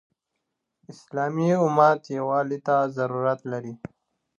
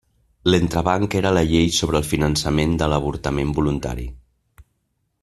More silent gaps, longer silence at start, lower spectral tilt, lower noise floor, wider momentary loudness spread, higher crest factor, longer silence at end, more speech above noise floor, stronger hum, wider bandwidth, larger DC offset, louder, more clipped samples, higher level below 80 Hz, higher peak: neither; first, 0.9 s vs 0.45 s; first, -7.5 dB/octave vs -5.5 dB/octave; first, -81 dBFS vs -71 dBFS; first, 15 LU vs 7 LU; about the same, 20 dB vs 20 dB; second, 0.65 s vs 1.05 s; first, 57 dB vs 52 dB; neither; second, 9.6 kHz vs 14 kHz; neither; second, -24 LUFS vs -20 LUFS; neither; second, -72 dBFS vs -34 dBFS; second, -6 dBFS vs -2 dBFS